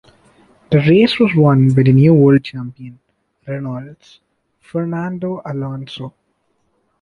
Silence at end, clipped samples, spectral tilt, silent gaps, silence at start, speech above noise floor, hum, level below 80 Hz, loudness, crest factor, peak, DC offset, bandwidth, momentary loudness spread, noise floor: 0.9 s; under 0.1%; -9 dB/octave; none; 0.7 s; 51 dB; none; -52 dBFS; -14 LUFS; 14 dB; -2 dBFS; under 0.1%; 5.4 kHz; 19 LU; -65 dBFS